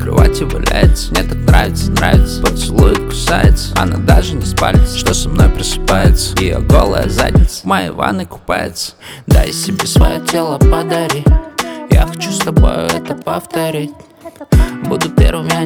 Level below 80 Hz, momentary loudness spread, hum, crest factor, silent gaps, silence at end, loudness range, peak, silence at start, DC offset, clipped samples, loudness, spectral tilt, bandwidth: -16 dBFS; 8 LU; none; 12 dB; none; 0 s; 3 LU; 0 dBFS; 0 s; under 0.1%; 0.1%; -13 LUFS; -5.5 dB/octave; 17.5 kHz